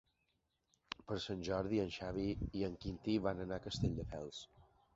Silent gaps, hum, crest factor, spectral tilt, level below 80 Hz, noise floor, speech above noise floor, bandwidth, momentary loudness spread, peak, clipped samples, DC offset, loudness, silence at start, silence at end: none; none; 22 dB; -5.5 dB/octave; -56 dBFS; -83 dBFS; 43 dB; 7.6 kHz; 12 LU; -20 dBFS; under 0.1%; under 0.1%; -41 LUFS; 1 s; 0.3 s